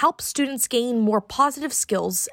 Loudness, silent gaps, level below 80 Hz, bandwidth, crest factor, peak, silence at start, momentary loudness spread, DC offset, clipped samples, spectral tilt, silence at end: -22 LUFS; none; -60 dBFS; 16.5 kHz; 16 dB; -6 dBFS; 0 s; 3 LU; under 0.1%; under 0.1%; -3 dB/octave; 0 s